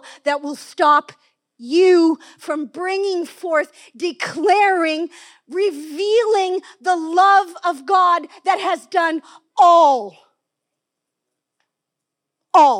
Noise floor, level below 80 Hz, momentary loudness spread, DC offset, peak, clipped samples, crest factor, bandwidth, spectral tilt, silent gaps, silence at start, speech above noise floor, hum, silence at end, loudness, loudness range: -82 dBFS; under -90 dBFS; 13 LU; under 0.1%; -2 dBFS; under 0.1%; 16 dB; 13.5 kHz; -3 dB/octave; none; 0.05 s; 65 dB; none; 0 s; -17 LUFS; 4 LU